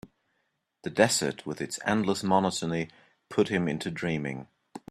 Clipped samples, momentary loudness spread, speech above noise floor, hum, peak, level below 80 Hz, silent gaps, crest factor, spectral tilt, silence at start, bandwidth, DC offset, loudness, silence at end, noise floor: under 0.1%; 16 LU; 49 dB; none; -4 dBFS; -64 dBFS; none; 24 dB; -4.5 dB/octave; 0.05 s; 13.5 kHz; under 0.1%; -28 LUFS; 0.15 s; -77 dBFS